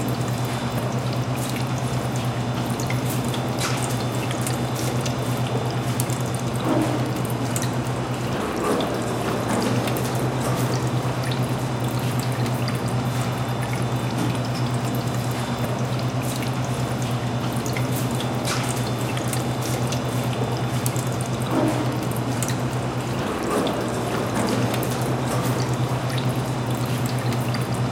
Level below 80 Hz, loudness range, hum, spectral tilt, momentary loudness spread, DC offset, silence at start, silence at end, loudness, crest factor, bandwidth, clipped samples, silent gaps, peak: -46 dBFS; 1 LU; none; -5.5 dB/octave; 2 LU; under 0.1%; 0 s; 0 s; -24 LUFS; 22 dB; 17 kHz; under 0.1%; none; -2 dBFS